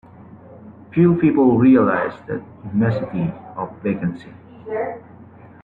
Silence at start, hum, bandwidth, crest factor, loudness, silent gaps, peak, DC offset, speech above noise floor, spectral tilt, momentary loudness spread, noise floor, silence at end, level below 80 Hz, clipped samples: 0.3 s; none; 4.4 kHz; 16 dB; -19 LUFS; none; -2 dBFS; under 0.1%; 25 dB; -11 dB/octave; 17 LU; -43 dBFS; 0.4 s; -54 dBFS; under 0.1%